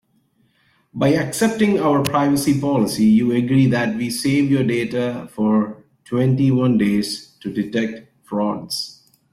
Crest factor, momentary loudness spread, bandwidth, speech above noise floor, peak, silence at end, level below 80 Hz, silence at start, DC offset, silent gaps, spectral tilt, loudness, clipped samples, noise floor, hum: 16 dB; 10 LU; 16 kHz; 44 dB; -2 dBFS; 0.4 s; -54 dBFS; 0.95 s; under 0.1%; none; -6 dB/octave; -19 LUFS; under 0.1%; -62 dBFS; none